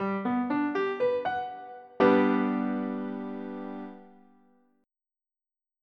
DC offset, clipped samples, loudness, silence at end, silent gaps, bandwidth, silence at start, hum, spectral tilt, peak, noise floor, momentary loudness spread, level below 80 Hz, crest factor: under 0.1%; under 0.1%; -28 LUFS; 1.75 s; none; 6 kHz; 0 s; none; -8.5 dB/octave; -10 dBFS; under -90 dBFS; 17 LU; -72 dBFS; 20 dB